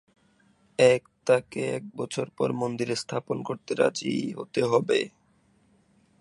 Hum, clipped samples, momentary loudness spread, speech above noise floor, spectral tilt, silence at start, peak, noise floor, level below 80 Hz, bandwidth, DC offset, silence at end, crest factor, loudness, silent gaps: none; under 0.1%; 11 LU; 38 dB; -5 dB/octave; 0.8 s; -6 dBFS; -64 dBFS; -68 dBFS; 11.5 kHz; under 0.1%; 1.1 s; 22 dB; -27 LUFS; none